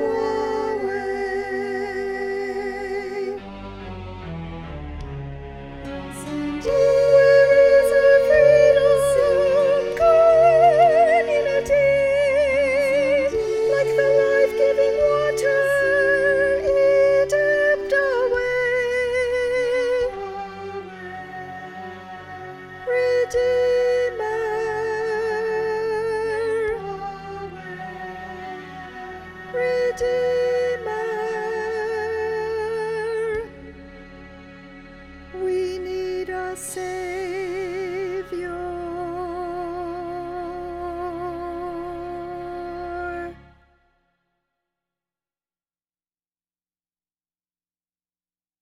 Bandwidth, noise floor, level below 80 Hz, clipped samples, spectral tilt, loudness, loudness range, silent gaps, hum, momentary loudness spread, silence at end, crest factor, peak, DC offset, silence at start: 13.5 kHz; under -90 dBFS; -46 dBFS; under 0.1%; -5 dB/octave; -20 LUFS; 15 LU; none; none; 19 LU; 5.25 s; 18 dB; -4 dBFS; under 0.1%; 0 s